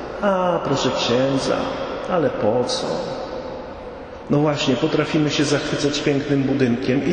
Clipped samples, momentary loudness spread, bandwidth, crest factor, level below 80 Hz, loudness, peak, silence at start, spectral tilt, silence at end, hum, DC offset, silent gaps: under 0.1%; 11 LU; 9.8 kHz; 16 dB; -46 dBFS; -20 LUFS; -4 dBFS; 0 s; -5.5 dB/octave; 0 s; none; under 0.1%; none